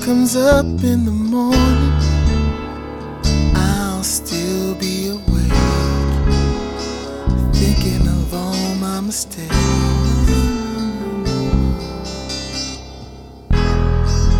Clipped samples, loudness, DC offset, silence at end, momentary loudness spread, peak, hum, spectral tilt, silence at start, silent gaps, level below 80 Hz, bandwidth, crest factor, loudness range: under 0.1%; -18 LUFS; under 0.1%; 0 s; 10 LU; -2 dBFS; none; -5.5 dB/octave; 0 s; none; -20 dBFS; 18 kHz; 14 dB; 4 LU